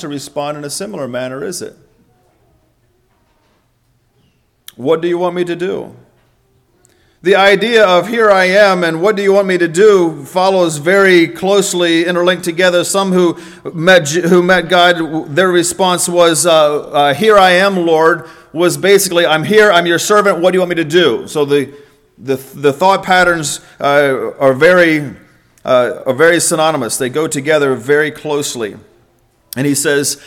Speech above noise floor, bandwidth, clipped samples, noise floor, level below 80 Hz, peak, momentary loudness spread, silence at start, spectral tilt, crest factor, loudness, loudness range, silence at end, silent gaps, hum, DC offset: 46 dB; 17.5 kHz; 0.3%; -57 dBFS; -52 dBFS; 0 dBFS; 13 LU; 0 s; -4 dB/octave; 12 dB; -11 LUFS; 10 LU; 0.1 s; none; none; under 0.1%